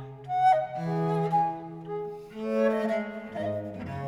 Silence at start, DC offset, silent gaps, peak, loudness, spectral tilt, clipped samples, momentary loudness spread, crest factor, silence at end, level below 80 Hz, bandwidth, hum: 0 s; under 0.1%; none; -14 dBFS; -29 LUFS; -8 dB/octave; under 0.1%; 13 LU; 16 dB; 0 s; -62 dBFS; 11 kHz; none